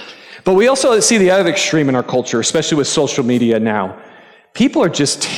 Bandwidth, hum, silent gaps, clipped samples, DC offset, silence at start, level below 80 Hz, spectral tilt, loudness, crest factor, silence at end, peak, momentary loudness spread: 16 kHz; none; none; under 0.1%; under 0.1%; 0 s; -54 dBFS; -3.5 dB/octave; -14 LUFS; 12 dB; 0 s; -2 dBFS; 8 LU